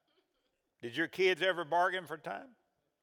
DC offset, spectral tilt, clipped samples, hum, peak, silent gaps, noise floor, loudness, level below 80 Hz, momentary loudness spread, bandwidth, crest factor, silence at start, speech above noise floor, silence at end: under 0.1%; -4 dB/octave; under 0.1%; none; -16 dBFS; none; -81 dBFS; -33 LUFS; -88 dBFS; 15 LU; 17 kHz; 20 dB; 0.85 s; 48 dB; 0.55 s